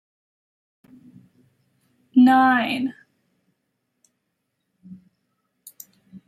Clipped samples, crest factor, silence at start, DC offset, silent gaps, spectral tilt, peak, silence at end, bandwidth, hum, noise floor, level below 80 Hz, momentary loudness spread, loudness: under 0.1%; 18 dB; 2.15 s; under 0.1%; none; -5 dB/octave; -6 dBFS; 0.1 s; 15 kHz; none; -77 dBFS; -76 dBFS; 29 LU; -18 LUFS